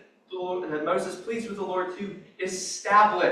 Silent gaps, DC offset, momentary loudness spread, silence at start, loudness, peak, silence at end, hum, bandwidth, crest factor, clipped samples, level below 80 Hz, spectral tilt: none; under 0.1%; 16 LU; 0.3 s; -27 LUFS; -8 dBFS; 0 s; none; 13 kHz; 18 dB; under 0.1%; -70 dBFS; -3.5 dB/octave